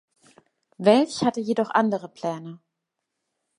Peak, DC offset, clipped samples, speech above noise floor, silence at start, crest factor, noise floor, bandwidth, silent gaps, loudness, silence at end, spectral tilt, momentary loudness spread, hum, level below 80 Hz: -4 dBFS; under 0.1%; under 0.1%; 59 dB; 0.8 s; 22 dB; -82 dBFS; 11.5 kHz; none; -23 LUFS; 1 s; -5.5 dB/octave; 13 LU; none; -72 dBFS